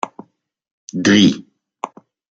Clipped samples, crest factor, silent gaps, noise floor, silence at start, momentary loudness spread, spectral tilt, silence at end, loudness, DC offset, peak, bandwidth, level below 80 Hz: under 0.1%; 18 dB; 0.71-0.88 s; -43 dBFS; 0.05 s; 20 LU; -4.5 dB/octave; 0.45 s; -14 LUFS; under 0.1%; -2 dBFS; 8 kHz; -58 dBFS